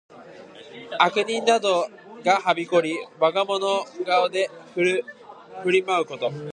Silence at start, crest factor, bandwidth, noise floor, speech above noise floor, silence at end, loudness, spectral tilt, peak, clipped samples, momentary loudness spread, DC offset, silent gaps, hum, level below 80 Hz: 0.1 s; 22 dB; 10.5 kHz; -44 dBFS; 21 dB; 0.05 s; -23 LUFS; -4 dB/octave; -2 dBFS; under 0.1%; 13 LU; under 0.1%; none; none; -76 dBFS